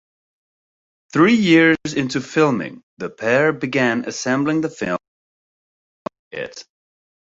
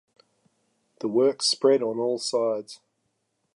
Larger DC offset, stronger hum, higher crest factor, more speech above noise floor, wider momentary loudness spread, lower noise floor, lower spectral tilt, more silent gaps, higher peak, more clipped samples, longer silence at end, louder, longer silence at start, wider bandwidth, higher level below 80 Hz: neither; neither; about the same, 18 dB vs 18 dB; first, over 72 dB vs 52 dB; first, 19 LU vs 12 LU; first, under -90 dBFS vs -75 dBFS; first, -5.5 dB/octave vs -3.5 dB/octave; first, 2.83-2.97 s, 5.08-6.05 s, 6.19-6.31 s vs none; first, -2 dBFS vs -8 dBFS; neither; second, 0.6 s vs 0.8 s; first, -18 LUFS vs -24 LUFS; about the same, 1.15 s vs 1.05 s; second, 8 kHz vs 11.5 kHz; first, -60 dBFS vs -84 dBFS